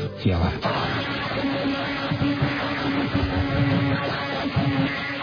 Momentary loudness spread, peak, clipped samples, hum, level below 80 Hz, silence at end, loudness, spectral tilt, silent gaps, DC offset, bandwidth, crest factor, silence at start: 4 LU; -10 dBFS; under 0.1%; none; -40 dBFS; 0 s; -24 LUFS; -7.5 dB/octave; none; under 0.1%; 5.4 kHz; 14 dB; 0 s